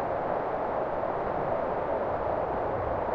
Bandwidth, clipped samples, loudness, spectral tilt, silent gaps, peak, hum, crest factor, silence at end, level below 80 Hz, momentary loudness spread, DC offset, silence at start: 6.4 kHz; under 0.1%; -30 LUFS; -9 dB/octave; none; -16 dBFS; none; 14 dB; 0 s; -48 dBFS; 1 LU; under 0.1%; 0 s